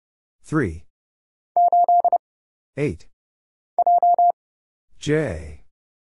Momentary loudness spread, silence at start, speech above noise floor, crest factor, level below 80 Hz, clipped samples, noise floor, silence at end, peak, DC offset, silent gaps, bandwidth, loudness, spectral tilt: 19 LU; 0.5 s; over 66 dB; 14 dB; -48 dBFS; under 0.1%; under -90 dBFS; 0.6 s; -8 dBFS; under 0.1%; 0.90-1.55 s, 2.19-2.73 s, 3.13-3.77 s, 4.33-4.88 s; 11 kHz; -20 LUFS; -7 dB/octave